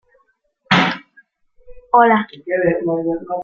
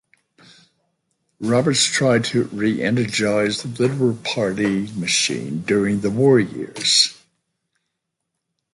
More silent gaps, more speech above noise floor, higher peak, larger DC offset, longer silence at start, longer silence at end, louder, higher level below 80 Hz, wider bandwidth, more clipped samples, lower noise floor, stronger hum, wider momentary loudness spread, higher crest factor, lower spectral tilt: neither; second, 46 dB vs 60 dB; about the same, 0 dBFS vs -2 dBFS; neither; second, 0.7 s vs 1.4 s; second, 0 s vs 1.6 s; about the same, -17 LUFS vs -19 LUFS; first, -52 dBFS vs -58 dBFS; second, 7.6 kHz vs 11.5 kHz; neither; second, -62 dBFS vs -79 dBFS; neither; first, 10 LU vs 7 LU; about the same, 18 dB vs 18 dB; first, -6 dB/octave vs -4 dB/octave